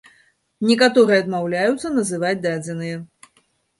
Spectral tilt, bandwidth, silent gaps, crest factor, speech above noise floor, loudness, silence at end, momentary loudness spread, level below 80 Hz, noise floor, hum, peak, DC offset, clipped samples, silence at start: -5 dB/octave; 11.5 kHz; none; 18 dB; 44 dB; -19 LUFS; 0.75 s; 14 LU; -62 dBFS; -63 dBFS; none; -2 dBFS; under 0.1%; under 0.1%; 0.6 s